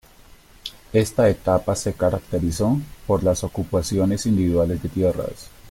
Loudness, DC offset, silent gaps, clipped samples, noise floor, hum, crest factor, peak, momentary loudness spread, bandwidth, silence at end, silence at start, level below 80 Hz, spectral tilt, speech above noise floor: -22 LUFS; under 0.1%; none; under 0.1%; -48 dBFS; none; 16 dB; -6 dBFS; 10 LU; 16.5 kHz; 0 s; 0.65 s; -42 dBFS; -6.5 dB/octave; 28 dB